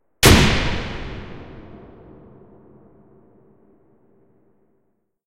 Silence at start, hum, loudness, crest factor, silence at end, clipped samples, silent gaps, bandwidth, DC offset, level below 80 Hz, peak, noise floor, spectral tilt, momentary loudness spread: 0.2 s; none; -16 LUFS; 22 dB; 3.5 s; under 0.1%; none; 16 kHz; under 0.1%; -32 dBFS; 0 dBFS; -69 dBFS; -4 dB/octave; 29 LU